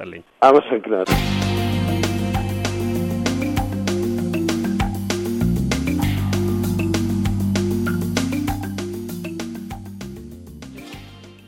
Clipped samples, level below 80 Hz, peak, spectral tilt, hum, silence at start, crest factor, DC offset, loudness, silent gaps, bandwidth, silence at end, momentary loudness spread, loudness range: under 0.1%; -34 dBFS; -2 dBFS; -6 dB/octave; none; 0 s; 20 dB; under 0.1%; -21 LUFS; none; 17 kHz; 0 s; 15 LU; 6 LU